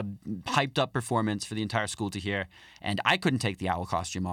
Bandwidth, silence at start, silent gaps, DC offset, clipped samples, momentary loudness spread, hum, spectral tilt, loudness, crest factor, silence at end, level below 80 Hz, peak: 16.5 kHz; 0 s; none; under 0.1%; under 0.1%; 8 LU; none; -4.5 dB/octave; -29 LUFS; 22 dB; 0 s; -62 dBFS; -8 dBFS